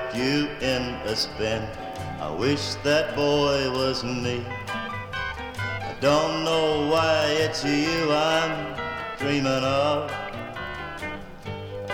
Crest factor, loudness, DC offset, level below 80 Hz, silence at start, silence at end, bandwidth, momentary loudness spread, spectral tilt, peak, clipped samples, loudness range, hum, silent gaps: 16 dB; -25 LUFS; under 0.1%; -46 dBFS; 0 s; 0 s; 17.5 kHz; 12 LU; -4.5 dB/octave; -8 dBFS; under 0.1%; 3 LU; none; none